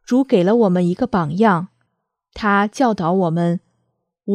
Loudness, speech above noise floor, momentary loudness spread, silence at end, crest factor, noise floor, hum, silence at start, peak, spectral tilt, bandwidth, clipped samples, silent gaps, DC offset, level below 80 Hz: -17 LUFS; 57 dB; 8 LU; 0 s; 16 dB; -73 dBFS; none; 0.1 s; -2 dBFS; -7.5 dB/octave; 10.5 kHz; under 0.1%; none; under 0.1%; -52 dBFS